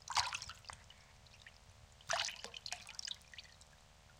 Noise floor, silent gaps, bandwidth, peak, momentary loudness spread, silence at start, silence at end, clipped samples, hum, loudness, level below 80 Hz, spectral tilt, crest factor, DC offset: -63 dBFS; none; 16.5 kHz; -16 dBFS; 23 LU; 0 s; 0 s; under 0.1%; none; -42 LUFS; -68 dBFS; 0 dB/octave; 30 dB; under 0.1%